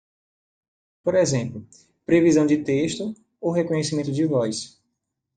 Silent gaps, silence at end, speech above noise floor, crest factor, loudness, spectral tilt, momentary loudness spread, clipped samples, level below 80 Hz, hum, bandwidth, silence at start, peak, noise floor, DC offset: none; 0.7 s; 57 dB; 18 dB; -22 LUFS; -5.5 dB/octave; 15 LU; under 0.1%; -62 dBFS; none; 9.4 kHz; 1.05 s; -6 dBFS; -79 dBFS; under 0.1%